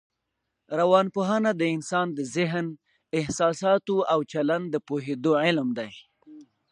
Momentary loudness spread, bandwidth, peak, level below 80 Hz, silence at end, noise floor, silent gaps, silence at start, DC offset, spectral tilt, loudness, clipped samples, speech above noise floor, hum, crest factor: 9 LU; 11.5 kHz; -6 dBFS; -64 dBFS; 0.3 s; -81 dBFS; none; 0.7 s; under 0.1%; -5.5 dB/octave; -25 LUFS; under 0.1%; 56 dB; none; 20 dB